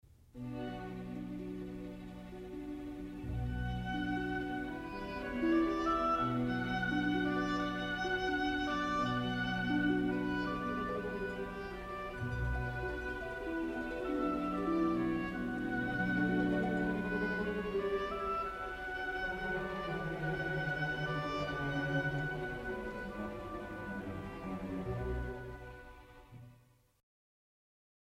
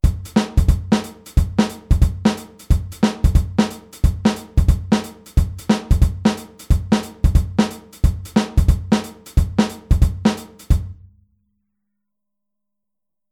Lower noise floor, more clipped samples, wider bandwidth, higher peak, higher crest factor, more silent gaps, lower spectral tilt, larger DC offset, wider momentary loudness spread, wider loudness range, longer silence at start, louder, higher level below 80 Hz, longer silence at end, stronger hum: second, -65 dBFS vs -85 dBFS; neither; about the same, 15 kHz vs 15.5 kHz; second, -20 dBFS vs -2 dBFS; about the same, 16 dB vs 18 dB; neither; about the same, -7 dB/octave vs -6.5 dB/octave; neither; first, 11 LU vs 4 LU; first, 9 LU vs 3 LU; first, 0.35 s vs 0.05 s; second, -37 LUFS vs -20 LUFS; second, -50 dBFS vs -22 dBFS; second, 1.45 s vs 2.4 s; neither